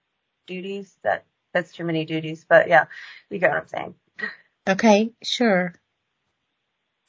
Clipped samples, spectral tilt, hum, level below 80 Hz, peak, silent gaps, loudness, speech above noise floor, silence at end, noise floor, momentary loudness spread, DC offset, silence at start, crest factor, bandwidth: under 0.1%; -5 dB/octave; none; -70 dBFS; -2 dBFS; none; -22 LUFS; 55 dB; 1.35 s; -76 dBFS; 16 LU; under 0.1%; 0.5 s; 20 dB; 7.8 kHz